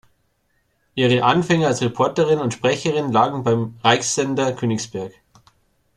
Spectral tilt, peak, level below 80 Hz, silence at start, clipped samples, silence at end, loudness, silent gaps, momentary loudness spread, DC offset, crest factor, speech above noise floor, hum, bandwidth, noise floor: -4.5 dB/octave; -2 dBFS; -56 dBFS; 0.95 s; under 0.1%; 0.85 s; -19 LUFS; none; 8 LU; under 0.1%; 18 dB; 47 dB; none; 12 kHz; -66 dBFS